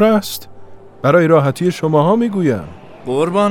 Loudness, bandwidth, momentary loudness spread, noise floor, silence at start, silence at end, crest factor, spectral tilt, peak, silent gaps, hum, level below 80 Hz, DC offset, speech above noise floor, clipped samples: -15 LUFS; 18 kHz; 15 LU; -34 dBFS; 0 s; 0 s; 14 dB; -7 dB/octave; 0 dBFS; none; none; -52 dBFS; under 0.1%; 21 dB; under 0.1%